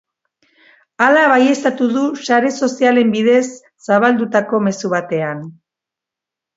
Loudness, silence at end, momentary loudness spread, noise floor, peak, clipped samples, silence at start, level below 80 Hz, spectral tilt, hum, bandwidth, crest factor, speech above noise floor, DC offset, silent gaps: -15 LUFS; 1.05 s; 10 LU; -85 dBFS; 0 dBFS; under 0.1%; 1 s; -68 dBFS; -5 dB/octave; none; 8 kHz; 16 dB; 71 dB; under 0.1%; none